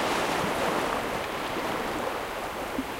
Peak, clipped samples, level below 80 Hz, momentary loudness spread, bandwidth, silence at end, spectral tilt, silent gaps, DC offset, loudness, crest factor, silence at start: -14 dBFS; under 0.1%; -50 dBFS; 6 LU; 16 kHz; 0 s; -3.5 dB/octave; none; under 0.1%; -29 LUFS; 16 dB; 0 s